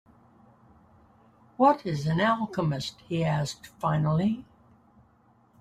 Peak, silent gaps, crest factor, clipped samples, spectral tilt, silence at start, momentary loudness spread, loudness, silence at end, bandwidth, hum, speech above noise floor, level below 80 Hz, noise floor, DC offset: -8 dBFS; none; 20 dB; under 0.1%; -6.5 dB/octave; 1.6 s; 9 LU; -27 LUFS; 1.2 s; 11.5 kHz; none; 36 dB; -60 dBFS; -62 dBFS; under 0.1%